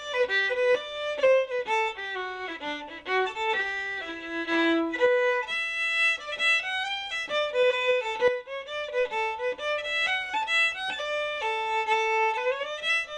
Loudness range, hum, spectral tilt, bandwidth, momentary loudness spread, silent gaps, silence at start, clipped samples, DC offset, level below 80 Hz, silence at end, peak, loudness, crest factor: 3 LU; none; -2 dB/octave; 10.5 kHz; 9 LU; none; 0 s; under 0.1%; under 0.1%; -64 dBFS; 0 s; -12 dBFS; -26 LUFS; 16 dB